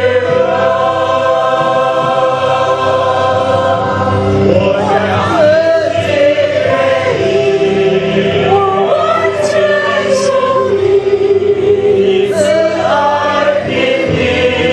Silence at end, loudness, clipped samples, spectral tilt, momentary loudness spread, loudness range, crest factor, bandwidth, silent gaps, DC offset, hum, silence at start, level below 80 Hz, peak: 0 s; -11 LUFS; under 0.1%; -5.5 dB/octave; 2 LU; 1 LU; 10 dB; 10 kHz; none; under 0.1%; none; 0 s; -42 dBFS; 0 dBFS